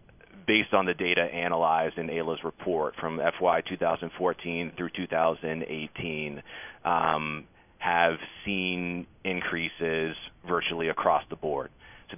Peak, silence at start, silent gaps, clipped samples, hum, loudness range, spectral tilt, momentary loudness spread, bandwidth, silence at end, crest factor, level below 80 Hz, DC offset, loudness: -6 dBFS; 0.35 s; none; under 0.1%; none; 3 LU; -8.5 dB/octave; 9 LU; 3.7 kHz; 0 s; 22 dB; -58 dBFS; under 0.1%; -28 LUFS